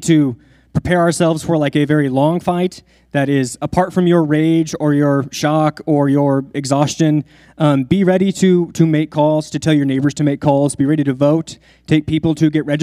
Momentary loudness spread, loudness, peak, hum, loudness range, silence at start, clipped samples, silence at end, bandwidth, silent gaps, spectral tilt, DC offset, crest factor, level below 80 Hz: 5 LU; -15 LUFS; 0 dBFS; none; 1 LU; 0 s; under 0.1%; 0 s; 14 kHz; none; -6.5 dB/octave; under 0.1%; 14 dB; -46 dBFS